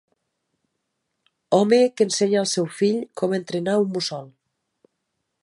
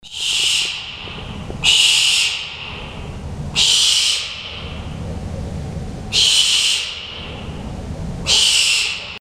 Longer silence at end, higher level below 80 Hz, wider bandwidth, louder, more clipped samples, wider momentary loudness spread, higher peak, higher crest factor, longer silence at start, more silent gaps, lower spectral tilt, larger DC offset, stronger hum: first, 1.15 s vs 0 s; second, -74 dBFS vs -36 dBFS; second, 11.5 kHz vs 16 kHz; second, -21 LUFS vs -14 LUFS; neither; second, 8 LU vs 19 LU; second, -4 dBFS vs 0 dBFS; about the same, 20 dB vs 20 dB; first, 1.5 s vs 0.05 s; neither; first, -4.5 dB/octave vs -0.5 dB/octave; neither; neither